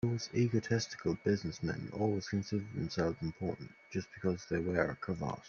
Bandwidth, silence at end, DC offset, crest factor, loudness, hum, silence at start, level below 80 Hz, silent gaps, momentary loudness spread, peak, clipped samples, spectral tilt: 7.4 kHz; 0 s; under 0.1%; 20 dB; -36 LUFS; none; 0.05 s; -62 dBFS; none; 8 LU; -14 dBFS; under 0.1%; -6 dB/octave